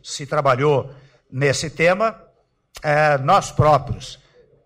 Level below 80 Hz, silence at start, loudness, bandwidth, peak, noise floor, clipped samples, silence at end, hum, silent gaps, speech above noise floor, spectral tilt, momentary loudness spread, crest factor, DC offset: -44 dBFS; 0.05 s; -18 LUFS; 15.5 kHz; -6 dBFS; -59 dBFS; under 0.1%; 0.5 s; none; none; 41 dB; -5 dB/octave; 15 LU; 14 dB; under 0.1%